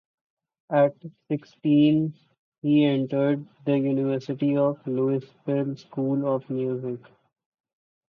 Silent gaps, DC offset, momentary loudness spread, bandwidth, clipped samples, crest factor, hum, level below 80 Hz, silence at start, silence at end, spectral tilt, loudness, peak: 2.39-2.52 s, 2.58-2.62 s; under 0.1%; 11 LU; 6.2 kHz; under 0.1%; 16 dB; none; -72 dBFS; 0.7 s; 1.1 s; -9.5 dB/octave; -25 LUFS; -10 dBFS